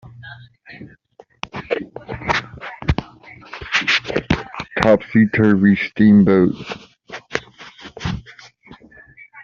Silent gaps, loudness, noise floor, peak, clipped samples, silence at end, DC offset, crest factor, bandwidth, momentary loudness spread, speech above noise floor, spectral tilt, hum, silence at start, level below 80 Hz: none; -18 LUFS; -49 dBFS; 0 dBFS; under 0.1%; 0 s; under 0.1%; 20 dB; 7.2 kHz; 23 LU; 36 dB; -5 dB/octave; none; 0.05 s; -40 dBFS